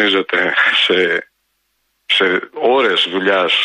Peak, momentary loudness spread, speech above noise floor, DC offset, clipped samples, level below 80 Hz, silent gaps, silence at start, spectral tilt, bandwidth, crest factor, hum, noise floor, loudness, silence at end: -2 dBFS; 5 LU; 52 dB; under 0.1%; under 0.1%; -66 dBFS; none; 0 s; -3.5 dB/octave; 11 kHz; 14 dB; none; -67 dBFS; -14 LUFS; 0 s